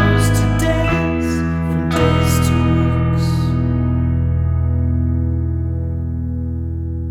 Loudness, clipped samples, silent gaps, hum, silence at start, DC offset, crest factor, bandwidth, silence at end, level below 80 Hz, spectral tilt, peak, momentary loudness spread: -17 LUFS; under 0.1%; none; none; 0 s; under 0.1%; 14 dB; 16 kHz; 0 s; -24 dBFS; -6.5 dB/octave; -2 dBFS; 8 LU